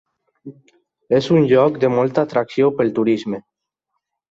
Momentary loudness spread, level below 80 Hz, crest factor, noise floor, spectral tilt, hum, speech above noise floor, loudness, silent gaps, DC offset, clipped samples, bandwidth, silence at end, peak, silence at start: 7 LU; -60 dBFS; 16 dB; -77 dBFS; -7.5 dB/octave; none; 60 dB; -17 LUFS; none; under 0.1%; under 0.1%; 7.8 kHz; 0.9 s; -2 dBFS; 0.45 s